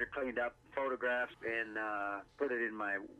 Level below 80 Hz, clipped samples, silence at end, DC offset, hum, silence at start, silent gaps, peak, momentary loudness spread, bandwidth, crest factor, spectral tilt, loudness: -70 dBFS; under 0.1%; 0 s; under 0.1%; none; 0 s; none; -24 dBFS; 4 LU; 11 kHz; 16 dB; -5.5 dB/octave; -38 LUFS